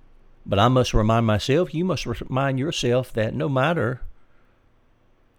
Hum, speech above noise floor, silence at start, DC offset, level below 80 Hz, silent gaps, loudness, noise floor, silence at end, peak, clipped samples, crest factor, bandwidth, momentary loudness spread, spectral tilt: none; 37 dB; 0.45 s; under 0.1%; -36 dBFS; none; -22 LUFS; -59 dBFS; 1.25 s; -4 dBFS; under 0.1%; 18 dB; 15 kHz; 8 LU; -6 dB/octave